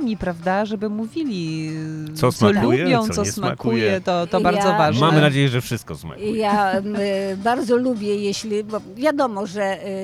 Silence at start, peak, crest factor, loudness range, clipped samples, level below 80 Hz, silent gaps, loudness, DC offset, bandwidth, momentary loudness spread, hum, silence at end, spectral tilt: 0 s; 0 dBFS; 18 dB; 4 LU; under 0.1%; -50 dBFS; none; -20 LUFS; under 0.1%; 15 kHz; 10 LU; none; 0 s; -5.5 dB/octave